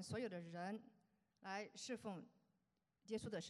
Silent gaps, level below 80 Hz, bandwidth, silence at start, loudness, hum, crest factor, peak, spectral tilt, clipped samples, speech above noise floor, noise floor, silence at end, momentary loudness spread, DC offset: none; -84 dBFS; 12.5 kHz; 0 s; -51 LUFS; none; 18 dB; -34 dBFS; -4.5 dB/octave; under 0.1%; 38 dB; -87 dBFS; 0 s; 11 LU; under 0.1%